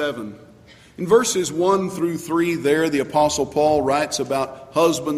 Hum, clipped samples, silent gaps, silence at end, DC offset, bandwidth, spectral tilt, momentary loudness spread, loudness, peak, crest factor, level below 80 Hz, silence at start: none; under 0.1%; none; 0 s; under 0.1%; 15.5 kHz; -4 dB/octave; 7 LU; -20 LUFS; -4 dBFS; 16 dB; -54 dBFS; 0 s